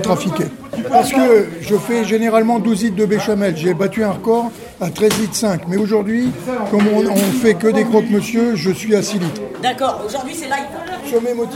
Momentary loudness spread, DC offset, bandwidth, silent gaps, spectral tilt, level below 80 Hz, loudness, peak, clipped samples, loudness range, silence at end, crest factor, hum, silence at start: 9 LU; under 0.1%; 16.5 kHz; none; -5.5 dB/octave; -52 dBFS; -16 LUFS; 0 dBFS; under 0.1%; 2 LU; 0 s; 14 dB; none; 0 s